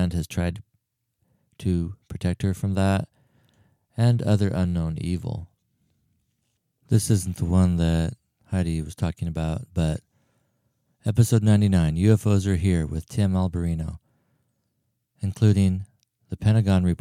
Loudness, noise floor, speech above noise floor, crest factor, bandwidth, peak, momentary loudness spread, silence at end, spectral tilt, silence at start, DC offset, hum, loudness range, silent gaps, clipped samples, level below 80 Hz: -24 LUFS; -75 dBFS; 53 dB; 20 dB; 15 kHz; -4 dBFS; 12 LU; 0.05 s; -7 dB/octave; 0 s; under 0.1%; none; 6 LU; none; under 0.1%; -42 dBFS